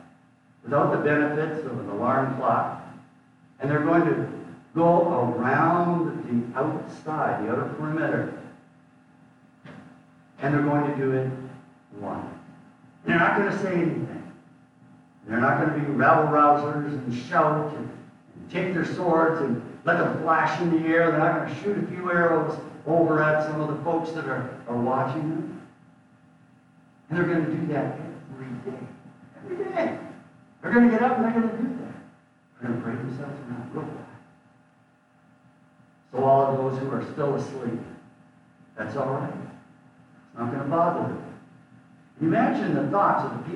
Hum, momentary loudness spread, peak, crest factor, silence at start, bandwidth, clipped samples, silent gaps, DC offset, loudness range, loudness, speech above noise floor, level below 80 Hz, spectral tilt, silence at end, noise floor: none; 17 LU; -6 dBFS; 20 dB; 0.65 s; 10.5 kHz; under 0.1%; none; under 0.1%; 8 LU; -25 LUFS; 36 dB; -68 dBFS; -8.5 dB/octave; 0 s; -60 dBFS